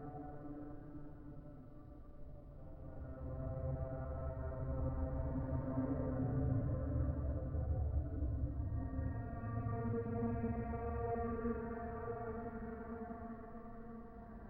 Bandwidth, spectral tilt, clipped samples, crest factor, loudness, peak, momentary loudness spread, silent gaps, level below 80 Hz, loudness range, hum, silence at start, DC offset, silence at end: 2.7 kHz; -12.5 dB/octave; under 0.1%; 16 dB; -42 LUFS; -26 dBFS; 15 LU; none; -46 dBFS; 8 LU; none; 0 s; under 0.1%; 0 s